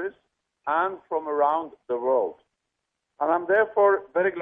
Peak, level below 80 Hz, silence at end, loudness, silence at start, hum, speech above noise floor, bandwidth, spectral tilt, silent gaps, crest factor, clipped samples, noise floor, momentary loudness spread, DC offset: -8 dBFS; -72 dBFS; 0 s; -24 LUFS; 0 s; none; 58 dB; 3.8 kHz; -8 dB/octave; none; 16 dB; under 0.1%; -81 dBFS; 11 LU; under 0.1%